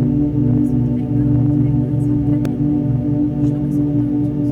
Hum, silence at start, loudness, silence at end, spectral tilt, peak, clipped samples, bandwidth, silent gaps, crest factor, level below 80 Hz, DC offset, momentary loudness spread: none; 0 s; -17 LUFS; 0 s; -11.5 dB/octave; -4 dBFS; under 0.1%; 3.7 kHz; none; 10 dB; -32 dBFS; under 0.1%; 3 LU